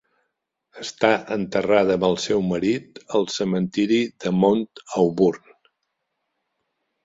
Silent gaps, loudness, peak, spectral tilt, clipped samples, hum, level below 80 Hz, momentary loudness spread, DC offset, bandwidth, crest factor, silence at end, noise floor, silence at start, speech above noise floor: none; -21 LUFS; -2 dBFS; -5.5 dB/octave; under 0.1%; none; -58 dBFS; 7 LU; under 0.1%; 7.8 kHz; 20 dB; 1.7 s; -77 dBFS; 0.75 s; 56 dB